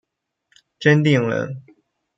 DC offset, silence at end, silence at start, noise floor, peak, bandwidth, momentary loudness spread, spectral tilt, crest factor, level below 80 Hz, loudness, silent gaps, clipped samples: under 0.1%; 0.55 s; 0.8 s; -67 dBFS; -2 dBFS; 7.8 kHz; 15 LU; -7 dB/octave; 18 dB; -64 dBFS; -18 LUFS; none; under 0.1%